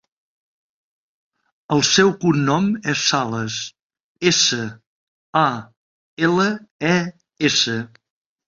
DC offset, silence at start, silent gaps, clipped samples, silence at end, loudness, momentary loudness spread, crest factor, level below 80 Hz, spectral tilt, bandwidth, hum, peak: under 0.1%; 1.7 s; 3.82-3.90 s, 4.03-4.15 s, 4.87-5.33 s, 5.77-6.17 s, 6.71-6.79 s; under 0.1%; 0.6 s; -19 LUFS; 13 LU; 20 dB; -60 dBFS; -3.5 dB/octave; 7.8 kHz; none; -2 dBFS